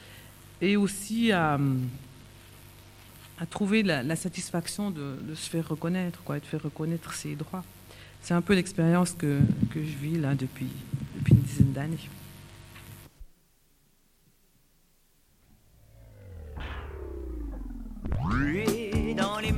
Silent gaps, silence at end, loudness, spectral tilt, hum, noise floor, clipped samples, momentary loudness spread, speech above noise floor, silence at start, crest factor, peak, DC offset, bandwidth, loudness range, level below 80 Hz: none; 0 s; -29 LUFS; -6 dB/octave; none; -64 dBFS; under 0.1%; 24 LU; 36 dB; 0 s; 22 dB; -8 dBFS; under 0.1%; 16 kHz; 15 LU; -44 dBFS